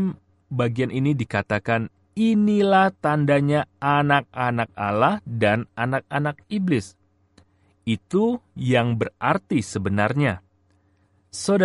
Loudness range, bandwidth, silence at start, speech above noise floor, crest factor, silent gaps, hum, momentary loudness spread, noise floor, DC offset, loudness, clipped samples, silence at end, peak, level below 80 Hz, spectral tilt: 4 LU; 11.5 kHz; 0 s; 41 dB; 18 dB; none; none; 9 LU; -62 dBFS; under 0.1%; -22 LUFS; under 0.1%; 0 s; -4 dBFS; -58 dBFS; -6.5 dB/octave